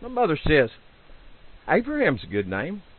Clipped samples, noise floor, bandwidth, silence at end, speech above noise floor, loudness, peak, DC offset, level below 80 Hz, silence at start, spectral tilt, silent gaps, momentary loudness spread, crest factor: under 0.1%; -47 dBFS; 4.4 kHz; 0.15 s; 23 dB; -24 LUFS; -6 dBFS; under 0.1%; -42 dBFS; 0 s; -10.5 dB/octave; none; 9 LU; 18 dB